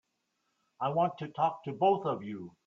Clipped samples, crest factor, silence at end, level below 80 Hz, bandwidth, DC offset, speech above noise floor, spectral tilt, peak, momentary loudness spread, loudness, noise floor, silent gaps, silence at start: under 0.1%; 18 dB; 0.15 s; -76 dBFS; 7 kHz; under 0.1%; 49 dB; -8 dB/octave; -14 dBFS; 9 LU; -31 LUFS; -80 dBFS; none; 0.8 s